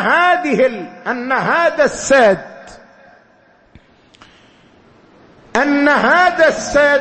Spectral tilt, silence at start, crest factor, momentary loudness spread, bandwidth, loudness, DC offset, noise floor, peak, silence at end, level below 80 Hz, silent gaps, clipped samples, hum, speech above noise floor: -3.5 dB/octave; 0 s; 16 dB; 11 LU; 8.8 kHz; -13 LUFS; under 0.1%; -51 dBFS; 0 dBFS; 0 s; -48 dBFS; none; under 0.1%; none; 38 dB